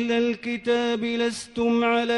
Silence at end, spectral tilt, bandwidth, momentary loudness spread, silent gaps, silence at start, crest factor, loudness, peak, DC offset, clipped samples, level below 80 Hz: 0 s; -4 dB/octave; 11.5 kHz; 5 LU; none; 0 s; 12 dB; -24 LUFS; -12 dBFS; under 0.1%; under 0.1%; -60 dBFS